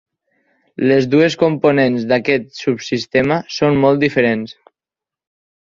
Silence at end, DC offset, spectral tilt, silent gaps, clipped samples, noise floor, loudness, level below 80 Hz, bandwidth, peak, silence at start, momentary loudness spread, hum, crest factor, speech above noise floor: 1.1 s; under 0.1%; -6.5 dB/octave; none; under 0.1%; -88 dBFS; -15 LUFS; -52 dBFS; 7.6 kHz; -2 dBFS; 0.8 s; 8 LU; none; 16 dB; 73 dB